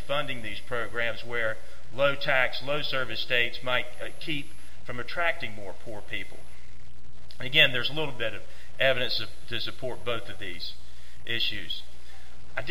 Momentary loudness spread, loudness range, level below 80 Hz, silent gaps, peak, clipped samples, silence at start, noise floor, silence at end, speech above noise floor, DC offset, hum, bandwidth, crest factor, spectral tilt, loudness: 17 LU; 7 LU; -52 dBFS; none; -6 dBFS; under 0.1%; 0 s; -50 dBFS; 0 s; 20 dB; 6%; none; 16 kHz; 24 dB; -4 dB/octave; -29 LUFS